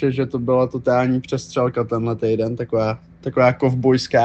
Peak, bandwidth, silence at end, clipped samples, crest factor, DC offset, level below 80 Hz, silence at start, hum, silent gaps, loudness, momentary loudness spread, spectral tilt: -4 dBFS; 8.4 kHz; 0 s; under 0.1%; 16 dB; under 0.1%; -52 dBFS; 0 s; none; none; -20 LUFS; 7 LU; -7 dB/octave